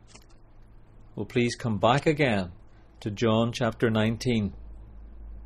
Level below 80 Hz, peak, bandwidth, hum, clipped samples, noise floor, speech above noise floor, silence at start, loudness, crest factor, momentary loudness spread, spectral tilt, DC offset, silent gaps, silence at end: -48 dBFS; -8 dBFS; 13.5 kHz; none; under 0.1%; -51 dBFS; 25 dB; 0.15 s; -26 LUFS; 20 dB; 22 LU; -6 dB/octave; under 0.1%; none; 0 s